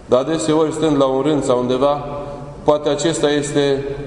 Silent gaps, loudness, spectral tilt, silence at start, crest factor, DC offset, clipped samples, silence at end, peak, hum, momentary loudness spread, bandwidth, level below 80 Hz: none; -17 LUFS; -5 dB/octave; 0 s; 18 dB; under 0.1%; under 0.1%; 0 s; 0 dBFS; none; 6 LU; 11 kHz; -42 dBFS